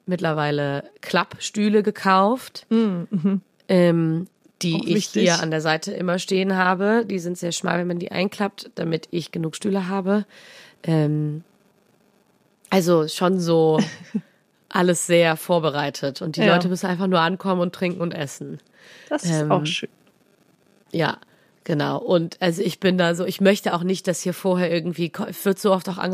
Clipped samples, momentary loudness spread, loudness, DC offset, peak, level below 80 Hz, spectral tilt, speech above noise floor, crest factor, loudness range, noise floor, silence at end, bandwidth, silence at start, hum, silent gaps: under 0.1%; 10 LU; -22 LUFS; under 0.1%; -4 dBFS; -70 dBFS; -5.5 dB/octave; 40 dB; 18 dB; 5 LU; -61 dBFS; 0 s; 15.5 kHz; 0.05 s; none; none